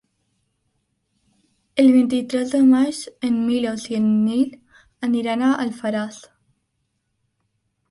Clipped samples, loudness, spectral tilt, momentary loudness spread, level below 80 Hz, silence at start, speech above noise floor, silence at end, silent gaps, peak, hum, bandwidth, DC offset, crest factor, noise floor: under 0.1%; -20 LUFS; -5.5 dB/octave; 11 LU; -64 dBFS; 1.75 s; 54 dB; 1.75 s; none; -6 dBFS; none; 11.5 kHz; under 0.1%; 16 dB; -73 dBFS